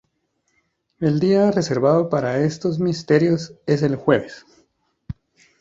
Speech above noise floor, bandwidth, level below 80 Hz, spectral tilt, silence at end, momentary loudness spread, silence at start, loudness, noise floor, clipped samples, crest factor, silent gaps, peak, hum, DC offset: 51 dB; 7.8 kHz; -54 dBFS; -7 dB/octave; 0.5 s; 20 LU; 1 s; -19 LUFS; -70 dBFS; under 0.1%; 18 dB; none; -2 dBFS; none; under 0.1%